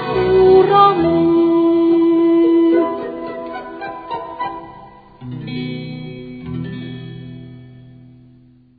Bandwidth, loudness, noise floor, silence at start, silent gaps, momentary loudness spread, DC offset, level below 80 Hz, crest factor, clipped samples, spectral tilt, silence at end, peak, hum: 4.8 kHz; -14 LUFS; -48 dBFS; 0 s; none; 21 LU; under 0.1%; -46 dBFS; 16 dB; under 0.1%; -10.5 dB/octave; 0.95 s; 0 dBFS; none